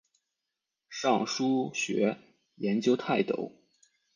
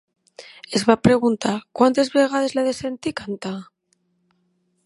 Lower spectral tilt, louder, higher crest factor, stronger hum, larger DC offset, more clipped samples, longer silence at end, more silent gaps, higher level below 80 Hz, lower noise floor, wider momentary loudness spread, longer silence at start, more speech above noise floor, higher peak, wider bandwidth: about the same, -4.5 dB/octave vs -5 dB/octave; second, -29 LUFS vs -20 LUFS; about the same, 18 dB vs 22 dB; neither; neither; neither; second, 0.65 s vs 1.2 s; neither; second, -78 dBFS vs -52 dBFS; first, -87 dBFS vs -68 dBFS; second, 10 LU vs 13 LU; first, 0.9 s vs 0.4 s; first, 58 dB vs 48 dB; second, -12 dBFS vs 0 dBFS; second, 10 kHz vs 11.5 kHz